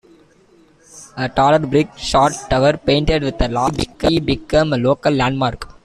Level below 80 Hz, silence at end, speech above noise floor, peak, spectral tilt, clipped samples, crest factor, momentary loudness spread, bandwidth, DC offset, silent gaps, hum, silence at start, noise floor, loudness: -32 dBFS; 0.15 s; 35 dB; -2 dBFS; -5.5 dB/octave; under 0.1%; 14 dB; 6 LU; 13.5 kHz; under 0.1%; none; none; 0.95 s; -51 dBFS; -17 LUFS